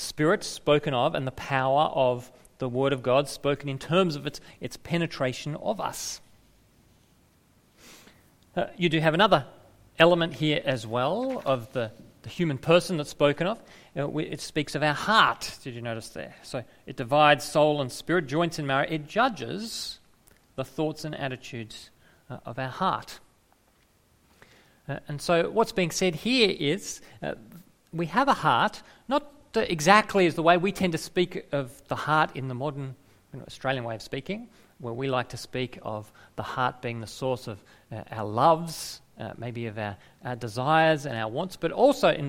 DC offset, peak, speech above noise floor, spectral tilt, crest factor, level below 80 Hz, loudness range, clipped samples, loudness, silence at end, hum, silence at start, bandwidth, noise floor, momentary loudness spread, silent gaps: under 0.1%; -2 dBFS; 37 dB; -5 dB/octave; 26 dB; -58 dBFS; 9 LU; under 0.1%; -26 LUFS; 0 s; none; 0 s; 16.5 kHz; -64 dBFS; 17 LU; none